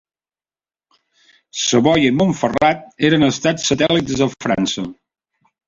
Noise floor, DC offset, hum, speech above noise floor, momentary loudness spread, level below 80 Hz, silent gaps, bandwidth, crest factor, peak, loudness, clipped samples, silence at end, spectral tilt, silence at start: under -90 dBFS; under 0.1%; none; over 74 dB; 7 LU; -48 dBFS; none; 7.8 kHz; 16 dB; -2 dBFS; -16 LUFS; under 0.1%; 0.75 s; -4.5 dB/octave; 1.55 s